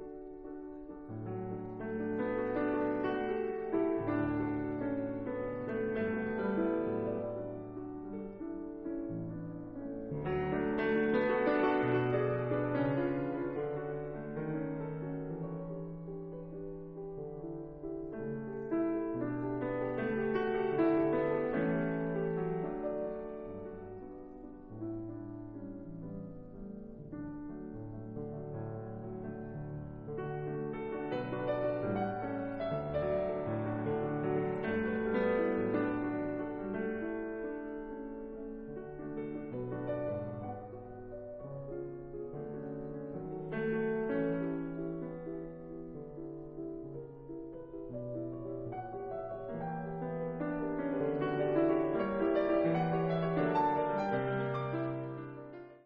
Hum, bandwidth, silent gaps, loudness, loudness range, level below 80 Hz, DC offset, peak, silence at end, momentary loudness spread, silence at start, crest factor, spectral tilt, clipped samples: none; 5.4 kHz; none; -36 LUFS; 11 LU; -58 dBFS; under 0.1%; -18 dBFS; 0.05 s; 14 LU; 0 s; 18 dB; -7 dB/octave; under 0.1%